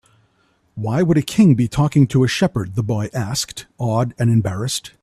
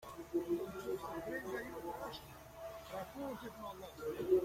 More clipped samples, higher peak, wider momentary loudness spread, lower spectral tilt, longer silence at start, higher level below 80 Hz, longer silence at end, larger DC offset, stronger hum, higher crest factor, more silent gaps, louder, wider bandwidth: neither; first, -2 dBFS vs -22 dBFS; about the same, 10 LU vs 11 LU; about the same, -6 dB/octave vs -5.5 dB/octave; first, 0.75 s vs 0 s; first, -46 dBFS vs -64 dBFS; first, 0.15 s vs 0 s; neither; neither; about the same, 16 dB vs 20 dB; neither; first, -18 LUFS vs -44 LUFS; second, 14 kHz vs 16.5 kHz